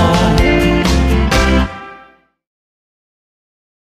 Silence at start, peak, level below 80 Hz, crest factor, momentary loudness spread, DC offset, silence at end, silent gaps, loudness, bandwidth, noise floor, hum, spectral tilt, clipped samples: 0 s; 0 dBFS; -20 dBFS; 14 dB; 6 LU; under 0.1%; 1.95 s; none; -13 LUFS; 15 kHz; -45 dBFS; none; -5.5 dB/octave; under 0.1%